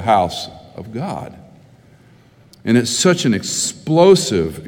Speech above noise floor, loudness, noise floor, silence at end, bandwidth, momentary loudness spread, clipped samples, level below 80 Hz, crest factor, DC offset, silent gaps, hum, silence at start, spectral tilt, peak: 32 dB; -16 LUFS; -48 dBFS; 0 s; 17 kHz; 19 LU; under 0.1%; -48 dBFS; 16 dB; under 0.1%; none; none; 0 s; -4.5 dB/octave; 0 dBFS